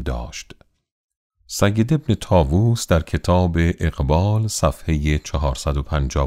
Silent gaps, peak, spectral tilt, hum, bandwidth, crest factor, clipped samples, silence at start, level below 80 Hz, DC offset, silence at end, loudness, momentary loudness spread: 0.92-1.09 s, 1.16-1.30 s; -2 dBFS; -6 dB/octave; none; 15.5 kHz; 18 dB; under 0.1%; 0 s; -28 dBFS; under 0.1%; 0 s; -20 LUFS; 7 LU